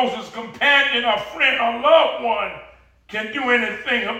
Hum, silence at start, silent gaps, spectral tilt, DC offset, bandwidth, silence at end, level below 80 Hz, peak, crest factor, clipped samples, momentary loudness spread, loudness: none; 0 s; none; -3 dB/octave; under 0.1%; 13 kHz; 0 s; -56 dBFS; -2 dBFS; 18 dB; under 0.1%; 14 LU; -18 LUFS